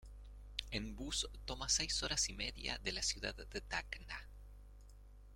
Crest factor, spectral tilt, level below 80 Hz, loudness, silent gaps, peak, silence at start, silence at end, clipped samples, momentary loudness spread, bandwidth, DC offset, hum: 26 dB; -1.5 dB/octave; -52 dBFS; -40 LUFS; none; -18 dBFS; 0 s; 0 s; under 0.1%; 22 LU; 16.5 kHz; under 0.1%; 50 Hz at -50 dBFS